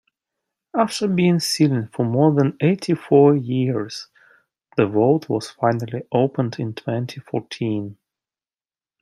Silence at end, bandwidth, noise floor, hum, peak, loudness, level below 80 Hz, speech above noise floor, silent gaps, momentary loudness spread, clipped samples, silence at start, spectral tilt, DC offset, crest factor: 1.1 s; 15.5 kHz; under -90 dBFS; none; -2 dBFS; -20 LUFS; -66 dBFS; over 71 dB; none; 11 LU; under 0.1%; 0.75 s; -6.5 dB/octave; under 0.1%; 18 dB